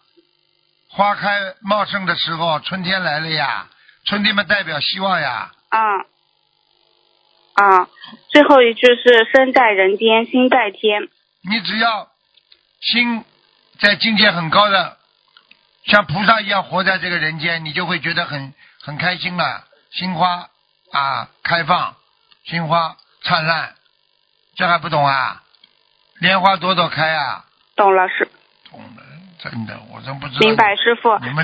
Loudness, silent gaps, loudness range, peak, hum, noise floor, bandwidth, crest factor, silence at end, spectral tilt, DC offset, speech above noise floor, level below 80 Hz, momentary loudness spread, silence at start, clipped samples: -16 LUFS; none; 8 LU; 0 dBFS; none; -62 dBFS; 8 kHz; 18 dB; 0 s; -6 dB/octave; under 0.1%; 46 dB; -58 dBFS; 15 LU; 0.95 s; under 0.1%